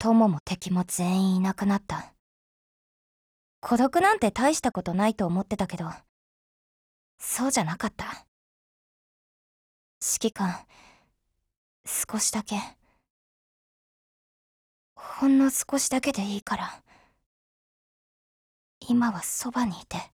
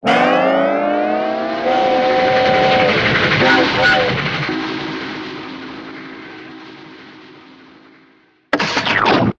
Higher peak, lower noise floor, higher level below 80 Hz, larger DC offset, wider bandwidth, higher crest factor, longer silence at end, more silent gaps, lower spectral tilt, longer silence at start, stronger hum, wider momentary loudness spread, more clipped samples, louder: second, -8 dBFS vs 0 dBFS; first, -76 dBFS vs -52 dBFS; second, -58 dBFS vs -46 dBFS; neither; first, 19 kHz vs 8.6 kHz; first, 22 dB vs 16 dB; about the same, 0.1 s vs 0.05 s; first, 0.40-0.46 s, 2.19-3.62 s, 6.09-7.18 s, 8.28-10.01 s, 11.57-11.84 s, 13.10-14.96 s, 16.42-16.46 s, 17.26-18.81 s vs none; about the same, -4.5 dB/octave vs -5 dB/octave; about the same, 0 s vs 0 s; neither; second, 16 LU vs 19 LU; neither; second, -26 LUFS vs -15 LUFS